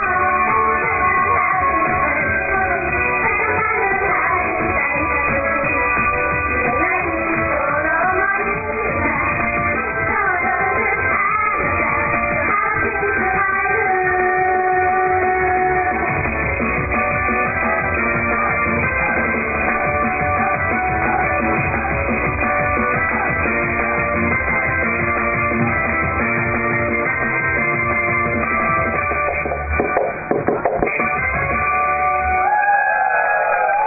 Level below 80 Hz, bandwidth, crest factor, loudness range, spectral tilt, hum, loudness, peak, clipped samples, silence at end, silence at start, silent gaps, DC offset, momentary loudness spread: -34 dBFS; 2.7 kHz; 14 dB; 1 LU; -14.5 dB/octave; none; -17 LUFS; -4 dBFS; under 0.1%; 0 s; 0 s; none; under 0.1%; 2 LU